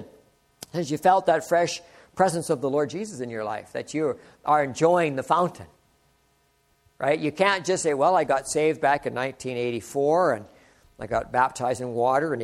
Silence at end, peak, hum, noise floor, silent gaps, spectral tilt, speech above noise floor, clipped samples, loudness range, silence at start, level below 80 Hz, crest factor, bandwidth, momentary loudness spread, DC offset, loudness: 0 s; -6 dBFS; none; -66 dBFS; none; -4.5 dB/octave; 42 dB; under 0.1%; 2 LU; 0 s; -60 dBFS; 20 dB; 15.5 kHz; 11 LU; under 0.1%; -24 LUFS